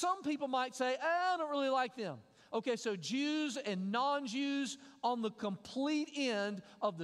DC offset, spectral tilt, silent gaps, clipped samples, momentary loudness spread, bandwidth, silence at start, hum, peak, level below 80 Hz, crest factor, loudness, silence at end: under 0.1%; -4 dB/octave; none; under 0.1%; 7 LU; 12.5 kHz; 0 s; none; -20 dBFS; -84 dBFS; 16 dB; -37 LUFS; 0 s